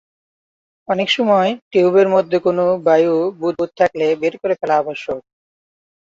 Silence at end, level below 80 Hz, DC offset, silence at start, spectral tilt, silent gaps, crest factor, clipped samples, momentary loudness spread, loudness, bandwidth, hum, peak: 0.95 s; -62 dBFS; under 0.1%; 0.9 s; -6 dB/octave; 1.62-1.71 s; 16 dB; under 0.1%; 8 LU; -16 LUFS; 7.8 kHz; none; -2 dBFS